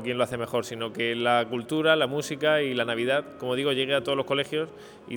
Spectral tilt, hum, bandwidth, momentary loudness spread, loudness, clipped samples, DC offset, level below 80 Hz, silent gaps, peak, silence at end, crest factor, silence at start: -4.5 dB/octave; none; over 20 kHz; 7 LU; -26 LUFS; under 0.1%; under 0.1%; -66 dBFS; none; -8 dBFS; 0 s; 20 dB; 0 s